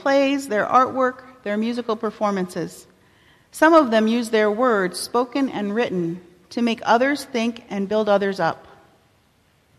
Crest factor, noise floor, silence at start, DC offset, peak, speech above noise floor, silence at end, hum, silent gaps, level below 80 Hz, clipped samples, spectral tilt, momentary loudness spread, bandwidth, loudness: 18 dB; -60 dBFS; 0 s; under 0.1%; -4 dBFS; 40 dB; 1.2 s; none; none; -64 dBFS; under 0.1%; -5 dB/octave; 11 LU; 14 kHz; -21 LUFS